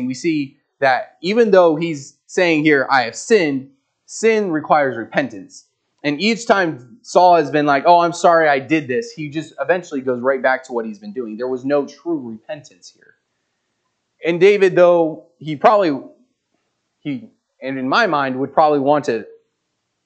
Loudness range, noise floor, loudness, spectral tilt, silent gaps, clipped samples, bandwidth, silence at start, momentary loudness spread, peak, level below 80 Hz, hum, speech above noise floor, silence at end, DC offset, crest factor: 6 LU; -73 dBFS; -17 LUFS; -5 dB/octave; none; under 0.1%; 9 kHz; 0 s; 16 LU; 0 dBFS; -72 dBFS; none; 56 dB; 0.75 s; under 0.1%; 18 dB